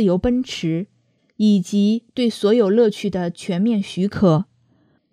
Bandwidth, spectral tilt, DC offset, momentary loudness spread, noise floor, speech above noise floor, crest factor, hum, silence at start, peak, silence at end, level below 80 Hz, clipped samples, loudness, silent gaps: 11.5 kHz; -7 dB/octave; under 0.1%; 8 LU; -60 dBFS; 42 dB; 16 dB; none; 0 s; -2 dBFS; 0.7 s; -48 dBFS; under 0.1%; -19 LUFS; none